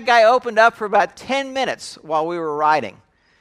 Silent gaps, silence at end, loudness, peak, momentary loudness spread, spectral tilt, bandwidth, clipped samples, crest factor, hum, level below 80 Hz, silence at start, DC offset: none; 0.5 s; -18 LUFS; 0 dBFS; 10 LU; -3.5 dB/octave; 12 kHz; under 0.1%; 18 dB; none; -64 dBFS; 0 s; under 0.1%